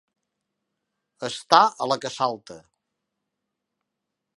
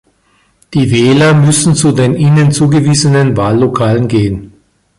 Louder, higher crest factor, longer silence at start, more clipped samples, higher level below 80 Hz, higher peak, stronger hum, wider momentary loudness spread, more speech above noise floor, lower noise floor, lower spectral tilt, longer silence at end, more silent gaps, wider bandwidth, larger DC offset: second, -22 LUFS vs -9 LUFS; first, 28 dB vs 10 dB; first, 1.2 s vs 0.7 s; neither; second, -74 dBFS vs -38 dBFS; about the same, 0 dBFS vs 0 dBFS; neither; first, 16 LU vs 6 LU; first, 60 dB vs 45 dB; first, -83 dBFS vs -53 dBFS; second, -3 dB/octave vs -5.5 dB/octave; first, 1.8 s vs 0.5 s; neither; about the same, 11.5 kHz vs 11.5 kHz; neither